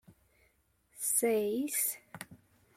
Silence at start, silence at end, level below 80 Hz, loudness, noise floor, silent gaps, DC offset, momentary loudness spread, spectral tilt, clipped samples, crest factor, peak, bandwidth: 0.1 s; 0.4 s; -76 dBFS; -31 LUFS; -72 dBFS; none; under 0.1%; 20 LU; -2.5 dB/octave; under 0.1%; 18 dB; -18 dBFS; 16.5 kHz